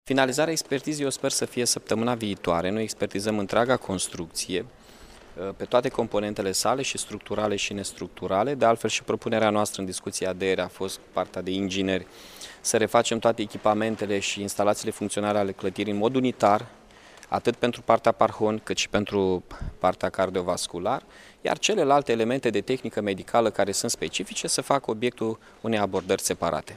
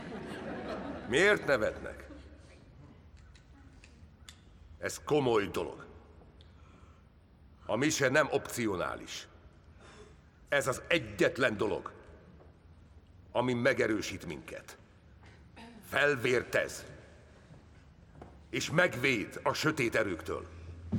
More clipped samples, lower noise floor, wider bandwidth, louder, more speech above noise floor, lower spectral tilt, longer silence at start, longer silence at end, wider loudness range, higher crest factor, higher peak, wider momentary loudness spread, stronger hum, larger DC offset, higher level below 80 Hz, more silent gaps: neither; second, -50 dBFS vs -59 dBFS; second, 15.5 kHz vs 18 kHz; first, -26 LUFS vs -32 LUFS; second, 24 dB vs 28 dB; about the same, -3.5 dB/octave vs -4.5 dB/octave; about the same, 0.05 s vs 0 s; about the same, 0 s vs 0 s; about the same, 3 LU vs 4 LU; about the same, 22 dB vs 22 dB; first, -4 dBFS vs -12 dBFS; second, 9 LU vs 24 LU; neither; neither; first, -54 dBFS vs -60 dBFS; neither